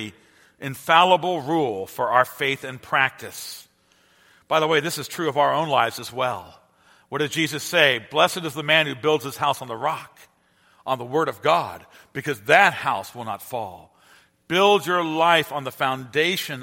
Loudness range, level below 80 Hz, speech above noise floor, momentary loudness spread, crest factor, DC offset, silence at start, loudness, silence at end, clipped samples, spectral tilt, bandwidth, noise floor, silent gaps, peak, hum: 3 LU; -68 dBFS; 38 dB; 15 LU; 24 dB; under 0.1%; 0 s; -21 LUFS; 0 s; under 0.1%; -3.5 dB/octave; 16.5 kHz; -60 dBFS; none; 0 dBFS; none